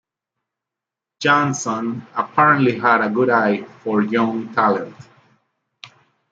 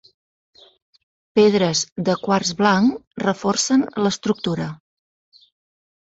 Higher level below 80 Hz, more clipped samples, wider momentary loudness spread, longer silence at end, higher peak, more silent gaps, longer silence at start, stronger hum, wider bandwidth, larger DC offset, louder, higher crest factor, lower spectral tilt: second, -68 dBFS vs -60 dBFS; neither; about the same, 10 LU vs 8 LU; second, 0.45 s vs 1.4 s; about the same, -2 dBFS vs -4 dBFS; second, none vs 1.92-1.96 s, 3.07-3.11 s; second, 1.2 s vs 1.35 s; neither; about the same, 8 kHz vs 8.2 kHz; neither; about the same, -18 LUFS vs -19 LUFS; about the same, 18 dB vs 18 dB; about the same, -5 dB/octave vs -4.5 dB/octave